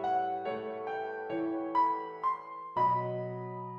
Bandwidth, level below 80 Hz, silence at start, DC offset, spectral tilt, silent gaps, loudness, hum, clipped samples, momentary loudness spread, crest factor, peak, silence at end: 6.4 kHz; -76 dBFS; 0 s; under 0.1%; -8.5 dB/octave; none; -33 LUFS; none; under 0.1%; 9 LU; 14 dB; -18 dBFS; 0 s